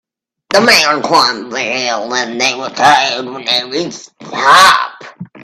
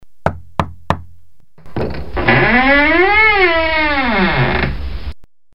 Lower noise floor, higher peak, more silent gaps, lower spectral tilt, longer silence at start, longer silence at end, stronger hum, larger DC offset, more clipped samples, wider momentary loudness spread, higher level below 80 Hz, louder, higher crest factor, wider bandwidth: second, -32 dBFS vs -45 dBFS; about the same, 0 dBFS vs 0 dBFS; neither; second, -1.5 dB/octave vs -7 dB/octave; first, 0.5 s vs 0 s; about the same, 0 s vs 0 s; neither; second, under 0.1% vs 6%; first, 0.2% vs under 0.1%; about the same, 17 LU vs 16 LU; second, -56 dBFS vs -30 dBFS; about the same, -11 LUFS vs -13 LUFS; about the same, 12 dB vs 14 dB; first, 19 kHz vs 10 kHz